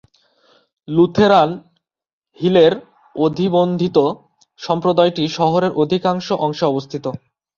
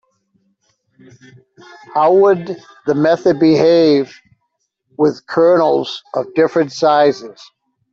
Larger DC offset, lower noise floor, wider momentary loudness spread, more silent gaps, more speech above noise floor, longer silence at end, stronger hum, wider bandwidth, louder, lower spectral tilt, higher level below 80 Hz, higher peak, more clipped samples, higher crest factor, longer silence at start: neither; second, -57 dBFS vs -70 dBFS; first, 15 LU vs 12 LU; first, 2.13-2.22 s vs none; second, 41 dB vs 56 dB; second, 0.4 s vs 0.6 s; neither; about the same, 7.2 kHz vs 7.4 kHz; second, -17 LUFS vs -14 LUFS; about the same, -7 dB/octave vs -6.5 dB/octave; about the same, -56 dBFS vs -60 dBFS; about the same, -2 dBFS vs -2 dBFS; neither; about the same, 16 dB vs 14 dB; second, 0.9 s vs 1.9 s